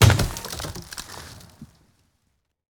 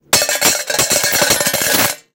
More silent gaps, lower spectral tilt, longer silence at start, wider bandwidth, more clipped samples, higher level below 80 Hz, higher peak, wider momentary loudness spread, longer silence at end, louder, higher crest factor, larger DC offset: neither; first, -4.5 dB/octave vs -0.5 dB/octave; about the same, 0 s vs 0.1 s; about the same, over 20 kHz vs over 20 kHz; neither; first, -36 dBFS vs -46 dBFS; about the same, -2 dBFS vs 0 dBFS; first, 25 LU vs 2 LU; first, 1.05 s vs 0.15 s; second, -26 LUFS vs -12 LUFS; first, 24 dB vs 16 dB; neither